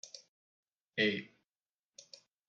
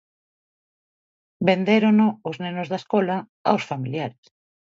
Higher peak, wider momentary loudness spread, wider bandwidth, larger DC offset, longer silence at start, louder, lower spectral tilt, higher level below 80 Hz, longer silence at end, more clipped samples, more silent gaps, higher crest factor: second, -18 dBFS vs -4 dBFS; first, 24 LU vs 12 LU; about the same, 8 kHz vs 7.4 kHz; neither; second, 0.05 s vs 1.4 s; second, -35 LUFS vs -22 LUFS; second, -4 dB/octave vs -7.5 dB/octave; second, under -90 dBFS vs -70 dBFS; first, 1.2 s vs 0.55 s; neither; first, 0.28-0.63 s, 0.72-0.76 s vs 3.29-3.45 s; about the same, 24 dB vs 20 dB